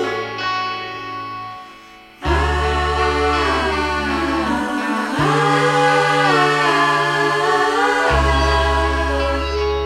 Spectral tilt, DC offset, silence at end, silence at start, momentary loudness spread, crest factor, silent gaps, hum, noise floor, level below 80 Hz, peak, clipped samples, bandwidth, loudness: -5 dB/octave; under 0.1%; 0 s; 0 s; 11 LU; 14 dB; none; none; -41 dBFS; -28 dBFS; -4 dBFS; under 0.1%; 14 kHz; -17 LUFS